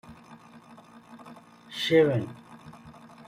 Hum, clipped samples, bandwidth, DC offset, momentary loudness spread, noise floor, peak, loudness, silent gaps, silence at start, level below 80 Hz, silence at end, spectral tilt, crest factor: none; under 0.1%; 15.5 kHz; under 0.1%; 27 LU; -51 dBFS; -10 dBFS; -24 LUFS; none; 0.1 s; -66 dBFS; 0.35 s; -6 dB/octave; 20 dB